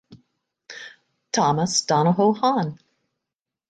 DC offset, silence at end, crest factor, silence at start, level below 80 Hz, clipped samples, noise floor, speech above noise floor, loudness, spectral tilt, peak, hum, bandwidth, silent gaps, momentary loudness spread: under 0.1%; 0.95 s; 16 dB; 0.1 s; -66 dBFS; under 0.1%; -86 dBFS; 66 dB; -21 LUFS; -4.5 dB/octave; -6 dBFS; none; 9.4 kHz; none; 20 LU